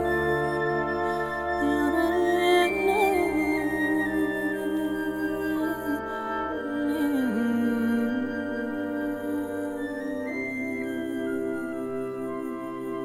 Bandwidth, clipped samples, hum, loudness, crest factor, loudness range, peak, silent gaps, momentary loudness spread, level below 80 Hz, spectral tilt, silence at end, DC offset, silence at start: 17.5 kHz; under 0.1%; none; -27 LUFS; 16 dB; 7 LU; -10 dBFS; none; 9 LU; -52 dBFS; -5.5 dB/octave; 0 s; under 0.1%; 0 s